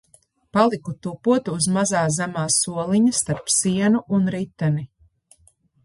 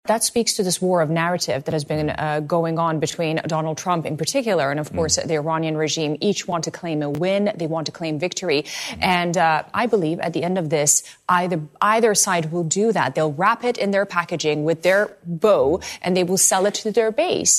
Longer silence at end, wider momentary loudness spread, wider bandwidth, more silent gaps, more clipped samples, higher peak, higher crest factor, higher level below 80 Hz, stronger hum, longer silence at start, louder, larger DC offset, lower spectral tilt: first, 1 s vs 0 s; about the same, 7 LU vs 7 LU; second, 11.5 kHz vs 14 kHz; neither; neither; about the same, -4 dBFS vs -4 dBFS; about the same, 18 dB vs 18 dB; about the same, -56 dBFS vs -54 dBFS; neither; first, 0.55 s vs 0.05 s; about the same, -21 LUFS vs -20 LUFS; neither; about the same, -4.5 dB/octave vs -3.5 dB/octave